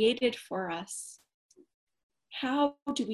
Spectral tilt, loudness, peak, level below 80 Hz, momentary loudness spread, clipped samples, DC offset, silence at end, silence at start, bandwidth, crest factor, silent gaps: -3.5 dB/octave; -32 LUFS; -14 dBFS; -74 dBFS; 12 LU; under 0.1%; under 0.1%; 0 s; 0 s; 12.5 kHz; 18 dB; 1.34-1.49 s, 1.74-1.87 s, 2.03-2.10 s, 2.82-2.86 s